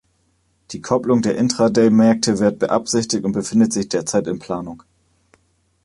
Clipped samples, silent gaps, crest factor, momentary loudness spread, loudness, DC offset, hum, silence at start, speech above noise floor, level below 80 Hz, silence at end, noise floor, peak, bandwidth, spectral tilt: under 0.1%; none; 16 dB; 13 LU; -18 LUFS; under 0.1%; none; 0.7 s; 46 dB; -54 dBFS; 1.05 s; -63 dBFS; -2 dBFS; 11.5 kHz; -5 dB/octave